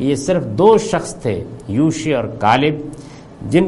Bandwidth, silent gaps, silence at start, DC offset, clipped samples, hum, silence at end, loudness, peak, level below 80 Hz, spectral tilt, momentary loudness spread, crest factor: 11.5 kHz; none; 0 s; under 0.1%; under 0.1%; none; 0 s; -16 LUFS; 0 dBFS; -44 dBFS; -6 dB/octave; 15 LU; 16 dB